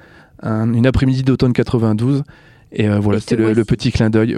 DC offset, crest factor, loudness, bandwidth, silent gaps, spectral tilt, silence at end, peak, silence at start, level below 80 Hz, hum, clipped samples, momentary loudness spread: under 0.1%; 14 dB; -16 LUFS; 11 kHz; none; -8 dB/octave; 0 s; 0 dBFS; 0.4 s; -34 dBFS; none; under 0.1%; 7 LU